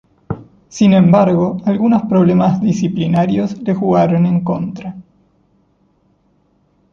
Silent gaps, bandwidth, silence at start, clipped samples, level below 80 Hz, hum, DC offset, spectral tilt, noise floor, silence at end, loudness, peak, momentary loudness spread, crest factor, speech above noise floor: none; 7.4 kHz; 0.3 s; under 0.1%; -48 dBFS; none; under 0.1%; -8 dB/octave; -57 dBFS; 1.9 s; -14 LUFS; -2 dBFS; 18 LU; 14 dB; 45 dB